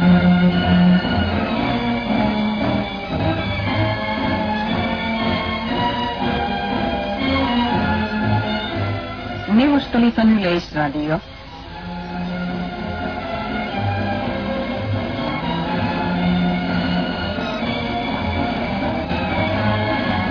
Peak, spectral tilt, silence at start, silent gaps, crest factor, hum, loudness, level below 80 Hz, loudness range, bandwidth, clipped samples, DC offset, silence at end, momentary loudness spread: -4 dBFS; -8 dB/octave; 0 s; none; 16 dB; none; -20 LUFS; -36 dBFS; 5 LU; 5.4 kHz; under 0.1%; under 0.1%; 0 s; 10 LU